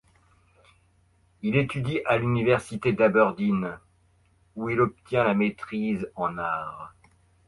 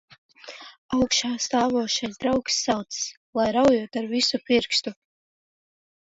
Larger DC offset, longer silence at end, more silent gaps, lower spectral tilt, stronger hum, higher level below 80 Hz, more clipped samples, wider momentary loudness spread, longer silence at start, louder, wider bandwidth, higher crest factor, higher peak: neither; second, 0.6 s vs 1.2 s; second, none vs 0.78-0.89 s, 3.17-3.33 s; first, -7.5 dB/octave vs -2.5 dB/octave; neither; about the same, -58 dBFS vs -56 dBFS; neither; about the same, 13 LU vs 13 LU; first, 1.45 s vs 0.45 s; about the same, -25 LUFS vs -23 LUFS; first, 11.5 kHz vs 8 kHz; about the same, 20 dB vs 18 dB; about the same, -6 dBFS vs -6 dBFS